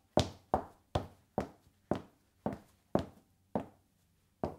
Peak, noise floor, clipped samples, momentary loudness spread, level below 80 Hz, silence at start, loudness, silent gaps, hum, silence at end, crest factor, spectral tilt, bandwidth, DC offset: -10 dBFS; -73 dBFS; under 0.1%; 10 LU; -58 dBFS; 0.15 s; -40 LUFS; none; none; 0 s; 30 dB; -6 dB/octave; 16.5 kHz; under 0.1%